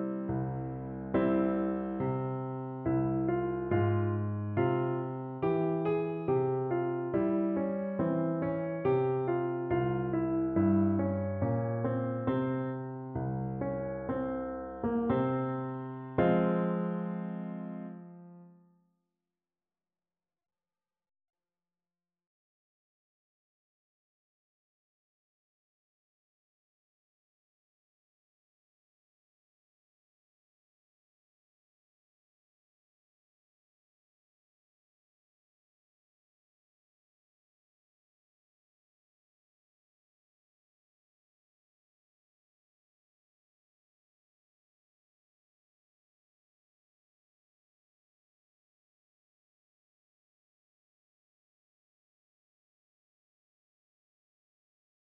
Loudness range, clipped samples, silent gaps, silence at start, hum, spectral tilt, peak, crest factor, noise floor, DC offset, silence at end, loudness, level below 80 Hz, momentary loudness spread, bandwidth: 4 LU; under 0.1%; none; 0 s; none; -9 dB/octave; -16 dBFS; 20 dB; under -90 dBFS; under 0.1%; 36.55 s; -32 LUFS; -62 dBFS; 9 LU; 4.1 kHz